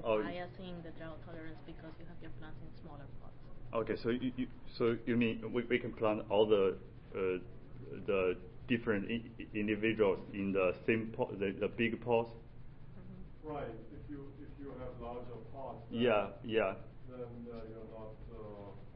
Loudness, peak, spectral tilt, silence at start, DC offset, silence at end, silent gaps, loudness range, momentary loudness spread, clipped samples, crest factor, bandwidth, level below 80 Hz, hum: -36 LUFS; -18 dBFS; -5 dB/octave; 0 s; under 0.1%; 0 s; none; 12 LU; 20 LU; under 0.1%; 20 dB; 5.4 kHz; -54 dBFS; none